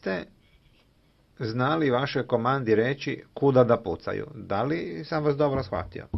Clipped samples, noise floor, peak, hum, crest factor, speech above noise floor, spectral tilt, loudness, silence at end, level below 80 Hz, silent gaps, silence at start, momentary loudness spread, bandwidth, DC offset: under 0.1%; -62 dBFS; -6 dBFS; none; 20 dB; 37 dB; -8 dB/octave; -26 LUFS; 0 s; -54 dBFS; none; 0.05 s; 12 LU; 6 kHz; under 0.1%